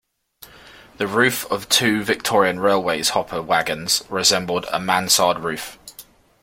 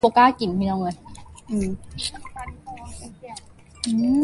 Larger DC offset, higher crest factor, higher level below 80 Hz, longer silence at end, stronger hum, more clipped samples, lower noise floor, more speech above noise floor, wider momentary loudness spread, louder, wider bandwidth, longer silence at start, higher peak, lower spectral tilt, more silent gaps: neither; about the same, 20 dB vs 20 dB; second, -56 dBFS vs -46 dBFS; first, 0.4 s vs 0 s; neither; neither; first, -48 dBFS vs -44 dBFS; first, 28 dB vs 23 dB; second, 11 LU vs 22 LU; first, -19 LUFS vs -23 LUFS; first, 16.5 kHz vs 11.5 kHz; first, 0.4 s vs 0.05 s; first, 0 dBFS vs -4 dBFS; second, -2 dB/octave vs -5 dB/octave; neither